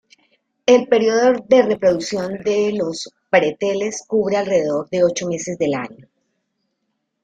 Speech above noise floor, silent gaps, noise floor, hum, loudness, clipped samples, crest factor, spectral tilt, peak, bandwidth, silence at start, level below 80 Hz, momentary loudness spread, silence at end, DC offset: 56 dB; none; -73 dBFS; none; -18 LUFS; under 0.1%; 18 dB; -4.5 dB/octave; -2 dBFS; 9.2 kHz; 0.65 s; -60 dBFS; 10 LU; 1.3 s; under 0.1%